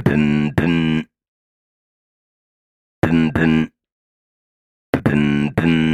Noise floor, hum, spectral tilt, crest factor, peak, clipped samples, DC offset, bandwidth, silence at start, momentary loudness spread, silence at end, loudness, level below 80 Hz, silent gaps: under -90 dBFS; none; -7.5 dB/octave; 18 dB; 0 dBFS; under 0.1%; under 0.1%; 11 kHz; 0 s; 8 LU; 0 s; -18 LUFS; -42 dBFS; 1.28-3.02 s, 3.92-4.93 s